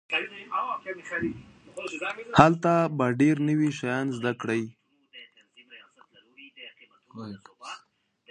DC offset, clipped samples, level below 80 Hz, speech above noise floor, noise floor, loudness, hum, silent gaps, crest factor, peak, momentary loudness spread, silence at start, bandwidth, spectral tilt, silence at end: under 0.1%; under 0.1%; -58 dBFS; 40 dB; -66 dBFS; -26 LUFS; none; none; 28 dB; 0 dBFS; 25 LU; 0.1 s; 10.5 kHz; -6.5 dB/octave; 0.55 s